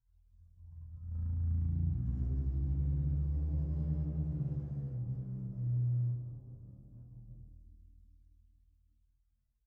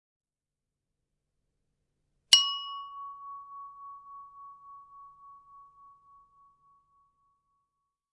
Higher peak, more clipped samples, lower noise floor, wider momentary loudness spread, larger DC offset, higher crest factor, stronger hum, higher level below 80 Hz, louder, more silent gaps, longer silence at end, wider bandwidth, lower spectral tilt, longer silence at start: second, -24 dBFS vs -2 dBFS; neither; second, -77 dBFS vs -89 dBFS; second, 20 LU vs 29 LU; neither; second, 14 dB vs 34 dB; neither; first, -40 dBFS vs -80 dBFS; second, -36 LUFS vs -24 LUFS; neither; second, 1.65 s vs 2.5 s; second, 1.6 kHz vs 8.8 kHz; first, -13 dB/octave vs 4 dB/octave; second, 0.4 s vs 2.3 s